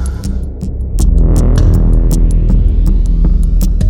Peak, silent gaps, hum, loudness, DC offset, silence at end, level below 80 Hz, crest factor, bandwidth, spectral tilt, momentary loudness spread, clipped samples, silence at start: 0 dBFS; none; none; -13 LUFS; under 0.1%; 0 s; -10 dBFS; 8 dB; 16 kHz; -7.5 dB/octave; 9 LU; under 0.1%; 0 s